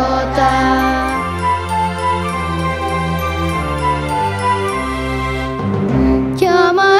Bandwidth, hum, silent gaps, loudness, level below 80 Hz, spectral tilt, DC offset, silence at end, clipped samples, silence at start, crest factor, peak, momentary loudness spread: 16 kHz; none; none; -16 LUFS; -28 dBFS; -6 dB/octave; under 0.1%; 0 s; under 0.1%; 0 s; 14 dB; 0 dBFS; 6 LU